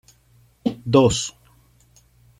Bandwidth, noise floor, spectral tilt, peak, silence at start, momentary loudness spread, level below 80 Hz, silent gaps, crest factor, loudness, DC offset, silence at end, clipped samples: 13 kHz; -57 dBFS; -5.5 dB/octave; -2 dBFS; 0.65 s; 12 LU; -48 dBFS; none; 20 dB; -20 LUFS; under 0.1%; 1.1 s; under 0.1%